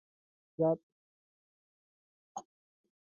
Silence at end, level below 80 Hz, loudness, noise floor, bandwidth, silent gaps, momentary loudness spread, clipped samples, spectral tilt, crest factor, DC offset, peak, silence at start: 0.65 s; -88 dBFS; -34 LUFS; under -90 dBFS; 7 kHz; 0.83-2.35 s; 17 LU; under 0.1%; -10.5 dB/octave; 22 dB; under 0.1%; -20 dBFS; 0.6 s